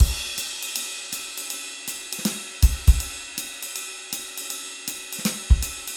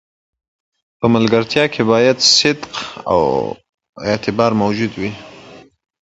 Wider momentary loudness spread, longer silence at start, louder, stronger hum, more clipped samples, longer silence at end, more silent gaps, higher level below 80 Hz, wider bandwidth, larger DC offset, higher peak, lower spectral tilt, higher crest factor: second, 10 LU vs 15 LU; second, 0 s vs 1 s; second, -26 LUFS vs -15 LUFS; neither; neither; second, 0 s vs 0.4 s; second, none vs 3.69-3.78 s, 3.89-3.93 s; first, -26 dBFS vs -48 dBFS; first, 19 kHz vs 8.2 kHz; neither; about the same, -2 dBFS vs 0 dBFS; about the same, -3 dB/octave vs -4 dB/octave; about the same, 22 dB vs 18 dB